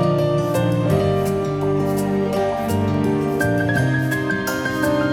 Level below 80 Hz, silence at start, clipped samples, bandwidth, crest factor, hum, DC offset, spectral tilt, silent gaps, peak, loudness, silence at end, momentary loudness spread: -44 dBFS; 0 s; under 0.1%; 18.5 kHz; 14 dB; none; under 0.1%; -6.5 dB/octave; none; -6 dBFS; -20 LUFS; 0 s; 3 LU